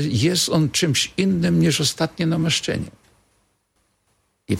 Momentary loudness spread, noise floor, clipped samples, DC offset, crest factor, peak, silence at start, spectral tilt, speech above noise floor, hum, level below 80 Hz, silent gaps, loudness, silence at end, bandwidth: 6 LU; -68 dBFS; under 0.1%; under 0.1%; 18 dB; -4 dBFS; 0 s; -4.5 dB/octave; 48 dB; none; -50 dBFS; none; -20 LUFS; 0 s; 16.5 kHz